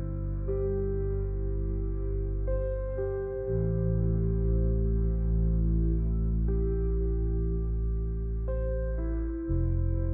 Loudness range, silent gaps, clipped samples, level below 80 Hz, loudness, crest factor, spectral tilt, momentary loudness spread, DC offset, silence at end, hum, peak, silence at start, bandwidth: 3 LU; none; under 0.1%; -30 dBFS; -31 LUFS; 10 dB; -14.5 dB/octave; 5 LU; under 0.1%; 0 s; none; -18 dBFS; 0 s; 2.1 kHz